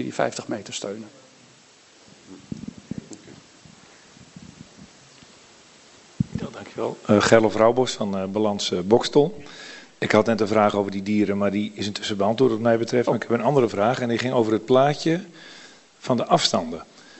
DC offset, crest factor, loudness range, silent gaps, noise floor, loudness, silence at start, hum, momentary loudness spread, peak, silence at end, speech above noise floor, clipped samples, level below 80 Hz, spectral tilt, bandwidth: under 0.1%; 24 dB; 21 LU; none; -53 dBFS; -22 LUFS; 0 s; none; 19 LU; 0 dBFS; 0.35 s; 31 dB; under 0.1%; -58 dBFS; -5 dB/octave; 8.4 kHz